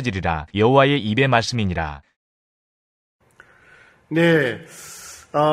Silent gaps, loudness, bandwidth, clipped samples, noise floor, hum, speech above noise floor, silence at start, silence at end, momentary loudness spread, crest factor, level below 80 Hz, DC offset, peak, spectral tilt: 2.16-3.19 s; -19 LUFS; 15.5 kHz; under 0.1%; -52 dBFS; none; 33 dB; 0 s; 0 s; 21 LU; 20 dB; -44 dBFS; under 0.1%; 0 dBFS; -6 dB/octave